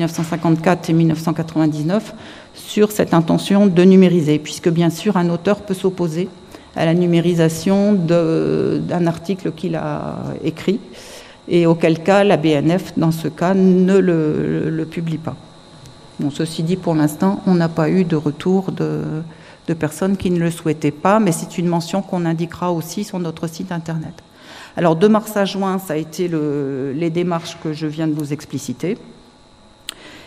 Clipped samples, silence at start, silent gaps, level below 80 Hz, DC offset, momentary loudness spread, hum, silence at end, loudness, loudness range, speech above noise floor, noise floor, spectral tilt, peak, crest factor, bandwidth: under 0.1%; 0 s; none; -52 dBFS; under 0.1%; 13 LU; none; 0.05 s; -18 LUFS; 6 LU; 30 dB; -47 dBFS; -7 dB/octave; 0 dBFS; 18 dB; 15 kHz